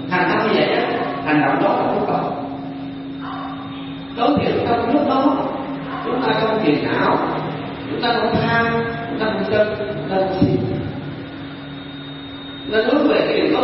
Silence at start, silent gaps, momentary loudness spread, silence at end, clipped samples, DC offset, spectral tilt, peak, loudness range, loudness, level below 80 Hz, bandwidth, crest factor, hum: 0 s; none; 14 LU; 0 s; under 0.1%; under 0.1%; -11 dB/octave; -2 dBFS; 3 LU; -19 LUFS; -48 dBFS; 5.8 kHz; 18 dB; none